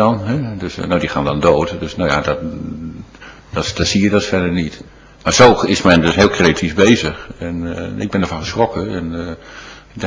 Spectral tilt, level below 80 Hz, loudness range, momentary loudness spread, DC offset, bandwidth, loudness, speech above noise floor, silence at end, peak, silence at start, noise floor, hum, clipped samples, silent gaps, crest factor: -5 dB/octave; -34 dBFS; 6 LU; 16 LU; under 0.1%; 8 kHz; -15 LUFS; 23 dB; 0 s; 0 dBFS; 0 s; -38 dBFS; none; 0.2%; none; 16 dB